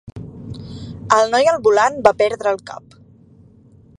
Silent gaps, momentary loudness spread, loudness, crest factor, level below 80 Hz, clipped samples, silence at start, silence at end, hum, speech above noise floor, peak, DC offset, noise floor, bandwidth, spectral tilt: none; 21 LU; -16 LUFS; 18 dB; -48 dBFS; under 0.1%; 0.15 s; 1.2 s; none; 32 dB; 0 dBFS; under 0.1%; -48 dBFS; 11 kHz; -4 dB/octave